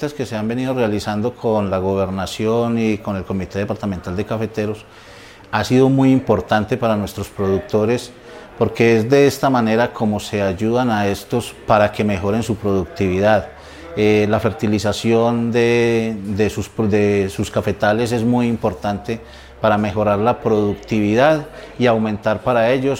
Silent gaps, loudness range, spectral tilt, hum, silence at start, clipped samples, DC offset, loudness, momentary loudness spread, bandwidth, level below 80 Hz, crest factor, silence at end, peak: none; 3 LU; -6.5 dB/octave; none; 0 s; under 0.1%; under 0.1%; -18 LUFS; 9 LU; 16.5 kHz; -44 dBFS; 18 dB; 0 s; 0 dBFS